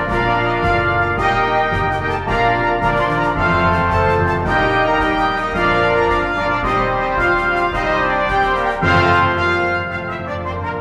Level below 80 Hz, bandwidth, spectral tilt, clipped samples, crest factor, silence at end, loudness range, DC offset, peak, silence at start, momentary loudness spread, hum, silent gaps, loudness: -32 dBFS; 12 kHz; -6.5 dB/octave; under 0.1%; 16 dB; 0 s; 1 LU; under 0.1%; 0 dBFS; 0 s; 4 LU; none; none; -16 LUFS